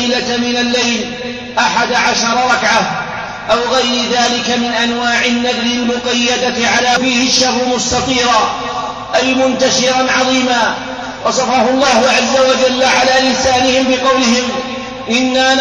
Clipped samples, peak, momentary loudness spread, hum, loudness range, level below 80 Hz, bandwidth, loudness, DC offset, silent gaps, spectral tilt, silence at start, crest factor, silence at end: under 0.1%; -2 dBFS; 8 LU; none; 2 LU; -42 dBFS; 10.5 kHz; -12 LUFS; under 0.1%; none; -2 dB/octave; 0 s; 12 dB; 0 s